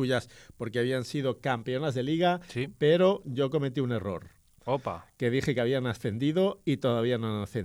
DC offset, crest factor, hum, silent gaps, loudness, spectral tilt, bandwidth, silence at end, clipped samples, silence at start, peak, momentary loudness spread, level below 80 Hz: under 0.1%; 16 dB; none; none; -29 LUFS; -6.5 dB/octave; 15 kHz; 0 s; under 0.1%; 0 s; -12 dBFS; 8 LU; -60 dBFS